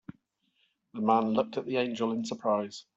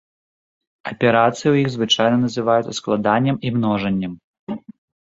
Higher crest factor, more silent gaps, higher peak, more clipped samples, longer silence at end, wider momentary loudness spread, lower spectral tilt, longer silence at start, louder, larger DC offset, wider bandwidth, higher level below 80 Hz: about the same, 20 dB vs 18 dB; second, none vs 4.24-4.47 s; second, -10 dBFS vs -2 dBFS; neither; second, 0.15 s vs 0.35 s; second, 6 LU vs 16 LU; about the same, -5.5 dB/octave vs -5.5 dB/octave; second, 0.1 s vs 0.85 s; second, -30 LUFS vs -18 LUFS; neither; about the same, 8 kHz vs 8 kHz; second, -76 dBFS vs -56 dBFS